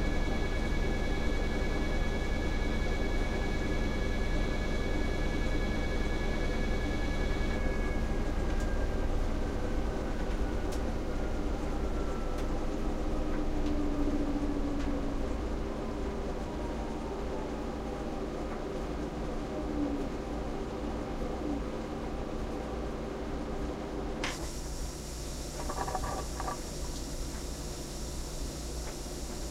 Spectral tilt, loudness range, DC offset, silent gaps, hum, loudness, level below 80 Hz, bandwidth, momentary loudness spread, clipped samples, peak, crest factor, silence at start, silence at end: -5.5 dB/octave; 4 LU; under 0.1%; none; none; -35 LUFS; -34 dBFS; 14.5 kHz; 5 LU; under 0.1%; -18 dBFS; 14 dB; 0 s; 0 s